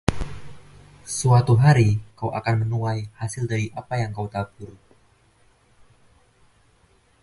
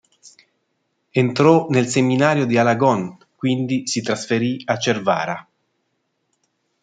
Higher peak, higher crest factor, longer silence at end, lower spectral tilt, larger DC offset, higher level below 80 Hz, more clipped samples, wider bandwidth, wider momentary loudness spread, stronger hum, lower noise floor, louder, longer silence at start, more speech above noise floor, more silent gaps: about the same, 0 dBFS vs -2 dBFS; first, 24 dB vs 18 dB; first, 2.5 s vs 1.4 s; about the same, -6.5 dB/octave vs -5.5 dB/octave; neither; first, -44 dBFS vs -64 dBFS; neither; first, 11.5 kHz vs 9.4 kHz; first, 20 LU vs 9 LU; neither; second, -59 dBFS vs -71 dBFS; second, -22 LUFS vs -19 LUFS; second, 0.1 s vs 0.25 s; second, 38 dB vs 53 dB; neither